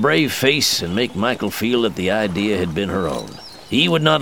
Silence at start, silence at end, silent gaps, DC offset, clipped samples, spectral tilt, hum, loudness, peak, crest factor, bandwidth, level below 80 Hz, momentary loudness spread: 0 s; 0 s; none; 0.4%; under 0.1%; -4 dB/octave; none; -18 LUFS; 0 dBFS; 18 dB; over 20 kHz; -48 dBFS; 8 LU